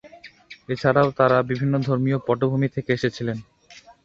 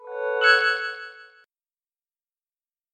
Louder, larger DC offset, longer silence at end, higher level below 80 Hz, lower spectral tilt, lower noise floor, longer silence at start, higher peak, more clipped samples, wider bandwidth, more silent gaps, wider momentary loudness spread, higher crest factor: about the same, -22 LUFS vs -20 LUFS; neither; second, 0.15 s vs 1.7 s; first, -56 dBFS vs -88 dBFS; first, -8 dB/octave vs 2.5 dB/octave; second, -49 dBFS vs under -90 dBFS; about the same, 0.05 s vs 0 s; about the same, -4 dBFS vs -6 dBFS; neither; second, 7.4 kHz vs 11.5 kHz; neither; second, 11 LU vs 20 LU; about the same, 20 dB vs 22 dB